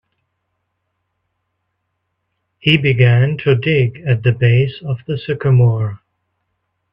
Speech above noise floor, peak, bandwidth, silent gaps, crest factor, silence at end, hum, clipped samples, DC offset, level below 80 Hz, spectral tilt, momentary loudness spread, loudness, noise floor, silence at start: 58 dB; 0 dBFS; 5.4 kHz; none; 16 dB; 0.95 s; none; under 0.1%; under 0.1%; -50 dBFS; -9 dB/octave; 10 LU; -15 LUFS; -72 dBFS; 2.65 s